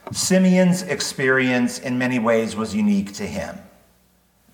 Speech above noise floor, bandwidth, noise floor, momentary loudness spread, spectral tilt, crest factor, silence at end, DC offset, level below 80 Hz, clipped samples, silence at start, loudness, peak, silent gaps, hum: 40 dB; 18.5 kHz; -60 dBFS; 12 LU; -5 dB/octave; 16 dB; 0.9 s; under 0.1%; -56 dBFS; under 0.1%; 0.05 s; -20 LUFS; -6 dBFS; none; none